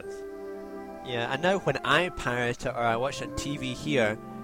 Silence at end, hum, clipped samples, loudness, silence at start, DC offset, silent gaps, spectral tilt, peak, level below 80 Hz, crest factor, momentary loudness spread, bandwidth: 0 s; none; under 0.1%; -28 LUFS; 0 s; under 0.1%; none; -4.5 dB/octave; -10 dBFS; -50 dBFS; 20 dB; 15 LU; 16.5 kHz